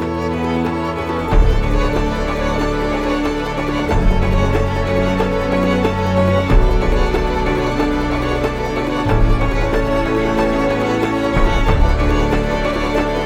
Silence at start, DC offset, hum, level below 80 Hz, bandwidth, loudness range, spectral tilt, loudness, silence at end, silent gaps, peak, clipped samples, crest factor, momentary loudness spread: 0 s; under 0.1%; none; -20 dBFS; 12 kHz; 2 LU; -7 dB/octave; -17 LUFS; 0 s; none; 0 dBFS; under 0.1%; 14 dB; 4 LU